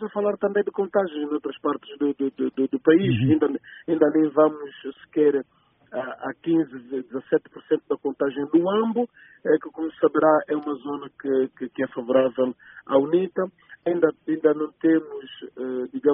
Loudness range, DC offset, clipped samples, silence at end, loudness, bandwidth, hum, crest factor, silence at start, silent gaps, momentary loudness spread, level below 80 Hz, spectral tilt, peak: 4 LU; under 0.1%; under 0.1%; 0 s; -24 LUFS; 3.8 kHz; none; 20 dB; 0 s; none; 12 LU; -66 dBFS; -4.5 dB/octave; -4 dBFS